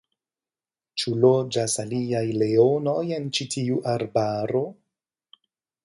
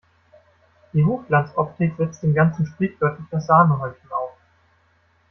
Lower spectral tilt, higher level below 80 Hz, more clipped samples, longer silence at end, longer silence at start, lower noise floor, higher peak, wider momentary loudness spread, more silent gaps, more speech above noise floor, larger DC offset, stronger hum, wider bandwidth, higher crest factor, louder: second, -5.5 dB/octave vs -9 dB/octave; second, -66 dBFS vs -56 dBFS; neither; about the same, 1.1 s vs 1 s; about the same, 0.95 s vs 0.95 s; first, under -90 dBFS vs -61 dBFS; about the same, -4 dBFS vs -4 dBFS; second, 8 LU vs 13 LU; neither; first, over 67 dB vs 41 dB; neither; neither; first, 11.5 kHz vs 6.2 kHz; about the same, 20 dB vs 18 dB; second, -24 LUFS vs -21 LUFS